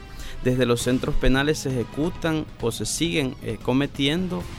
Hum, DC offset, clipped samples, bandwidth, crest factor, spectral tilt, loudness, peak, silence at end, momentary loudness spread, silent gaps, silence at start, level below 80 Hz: none; under 0.1%; under 0.1%; 16.5 kHz; 18 dB; -5 dB/octave; -24 LUFS; -6 dBFS; 0 s; 7 LU; none; 0 s; -34 dBFS